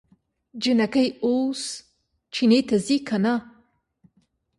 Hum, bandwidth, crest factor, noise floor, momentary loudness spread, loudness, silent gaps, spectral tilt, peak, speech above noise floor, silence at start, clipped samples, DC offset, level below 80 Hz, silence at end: none; 11.5 kHz; 18 dB; -67 dBFS; 13 LU; -23 LUFS; none; -5 dB/octave; -8 dBFS; 45 dB; 0.55 s; under 0.1%; under 0.1%; -64 dBFS; 1.1 s